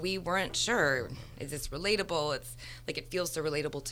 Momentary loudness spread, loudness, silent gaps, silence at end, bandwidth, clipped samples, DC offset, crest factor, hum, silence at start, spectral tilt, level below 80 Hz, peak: 13 LU; -32 LUFS; none; 0 s; 19.5 kHz; under 0.1%; under 0.1%; 18 dB; none; 0 s; -3 dB/octave; -50 dBFS; -14 dBFS